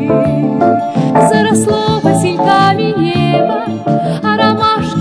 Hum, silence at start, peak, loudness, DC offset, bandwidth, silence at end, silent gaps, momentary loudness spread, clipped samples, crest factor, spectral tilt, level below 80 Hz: none; 0 s; 0 dBFS; -12 LUFS; 0.1%; 11 kHz; 0 s; none; 5 LU; 0.2%; 12 dB; -6 dB/octave; -44 dBFS